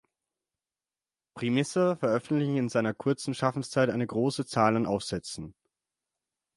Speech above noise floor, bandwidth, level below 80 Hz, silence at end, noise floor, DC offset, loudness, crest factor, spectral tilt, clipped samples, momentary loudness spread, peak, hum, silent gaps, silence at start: over 62 dB; 11.5 kHz; -64 dBFS; 1.05 s; under -90 dBFS; under 0.1%; -28 LUFS; 20 dB; -6 dB/octave; under 0.1%; 9 LU; -10 dBFS; none; none; 1.35 s